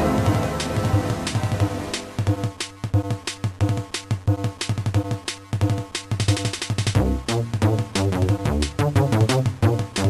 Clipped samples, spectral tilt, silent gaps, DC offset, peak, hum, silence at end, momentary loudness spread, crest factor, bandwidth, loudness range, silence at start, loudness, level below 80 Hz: under 0.1%; -5.5 dB/octave; none; under 0.1%; -6 dBFS; none; 0 s; 7 LU; 16 dB; 14 kHz; 4 LU; 0 s; -23 LUFS; -36 dBFS